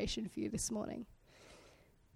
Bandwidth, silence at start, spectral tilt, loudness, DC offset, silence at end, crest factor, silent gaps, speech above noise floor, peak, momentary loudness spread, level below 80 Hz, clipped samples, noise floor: 16 kHz; 0 s; -4 dB/octave; -41 LUFS; under 0.1%; 0.4 s; 16 dB; none; 25 dB; -28 dBFS; 22 LU; -58 dBFS; under 0.1%; -65 dBFS